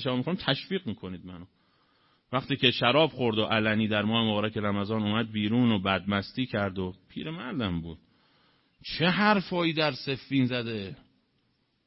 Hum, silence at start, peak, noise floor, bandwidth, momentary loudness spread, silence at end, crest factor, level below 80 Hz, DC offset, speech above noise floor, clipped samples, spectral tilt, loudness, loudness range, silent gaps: none; 0 s; -6 dBFS; -72 dBFS; 5.8 kHz; 14 LU; 0.9 s; 22 dB; -60 dBFS; under 0.1%; 44 dB; under 0.1%; -9.5 dB/octave; -27 LUFS; 4 LU; none